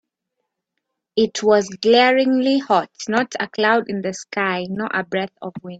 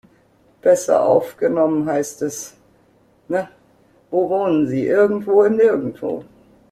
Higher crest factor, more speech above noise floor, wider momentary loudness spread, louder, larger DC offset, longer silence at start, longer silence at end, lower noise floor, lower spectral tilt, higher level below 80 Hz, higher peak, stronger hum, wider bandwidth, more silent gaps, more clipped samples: about the same, 18 dB vs 16 dB; first, 59 dB vs 39 dB; about the same, 11 LU vs 12 LU; about the same, -19 LUFS vs -18 LUFS; neither; first, 1.15 s vs 0.65 s; second, 0 s vs 0.5 s; first, -78 dBFS vs -56 dBFS; second, -4 dB/octave vs -6 dB/octave; about the same, -64 dBFS vs -60 dBFS; about the same, -2 dBFS vs -2 dBFS; neither; second, 8 kHz vs 15 kHz; neither; neither